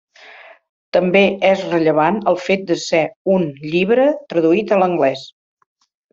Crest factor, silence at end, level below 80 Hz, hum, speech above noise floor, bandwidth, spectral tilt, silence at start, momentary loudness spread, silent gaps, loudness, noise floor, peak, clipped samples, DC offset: 16 dB; 0.85 s; -60 dBFS; none; 26 dB; 7.8 kHz; -6 dB/octave; 0.95 s; 5 LU; 3.16-3.25 s; -16 LUFS; -42 dBFS; -2 dBFS; under 0.1%; under 0.1%